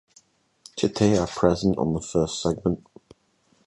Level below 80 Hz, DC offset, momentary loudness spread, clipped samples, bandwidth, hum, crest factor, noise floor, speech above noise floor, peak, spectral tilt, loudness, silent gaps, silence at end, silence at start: -46 dBFS; under 0.1%; 7 LU; under 0.1%; 11.5 kHz; none; 22 dB; -65 dBFS; 42 dB; -4 dBFS; -6 dB/octave; -24 LUFS; none; 0.9 s; 0.75 s